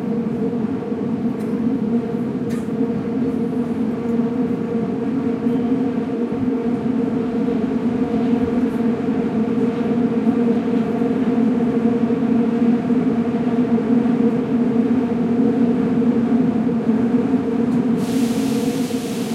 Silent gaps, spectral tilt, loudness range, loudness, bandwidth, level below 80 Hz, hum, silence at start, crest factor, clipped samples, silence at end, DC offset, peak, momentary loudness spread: none; -8 dB/octave; 4 LU; -19 LUFS; 13 kHz; -52 dBFS; none; 0 s; 14 dB; under 0.1%; 0 s; under 0.1%; -6 dBFS; 5 LU